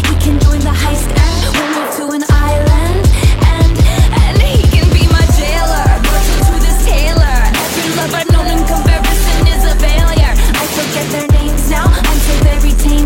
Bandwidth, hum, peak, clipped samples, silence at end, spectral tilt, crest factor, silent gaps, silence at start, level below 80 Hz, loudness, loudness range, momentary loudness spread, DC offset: 17 kHz; none; 0 dBFS; under 0.1%; 0 s; -5 dB/octave; 8 dB; none; 0 s; -10 dBFS; -12 LUFS; 2 LU; 4 LU; under 0.1%